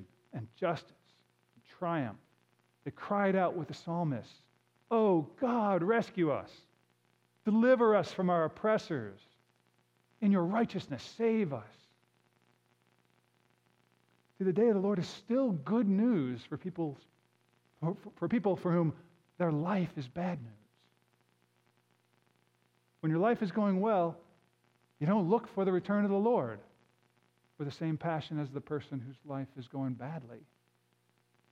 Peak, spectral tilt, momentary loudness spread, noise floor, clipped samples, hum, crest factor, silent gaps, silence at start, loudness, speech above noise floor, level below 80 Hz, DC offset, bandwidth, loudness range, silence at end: -16 dBFS; -8.5 dB/octave; 14 LU; -74 dBFS; under 0.1%; 60 Hz at -60 dBFS; 18 dB; none; 0 s; -33 LUFS; 42 dB; -78 dBFS; under 0.1%; 8 kHz; 8 LU; 1.15 s